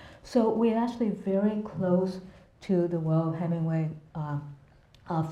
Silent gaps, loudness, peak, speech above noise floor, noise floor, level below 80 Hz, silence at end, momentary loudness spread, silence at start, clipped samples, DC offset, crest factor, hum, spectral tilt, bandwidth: none; -29 LUFS; -12 dBFS; 29 dB; -56 dBFS; -62 dBFS; 0 s; 10 LU; 0 s; under 0.1%; under 0.1%; 16 dB; none; -9 dB/octave; 8.8 kHz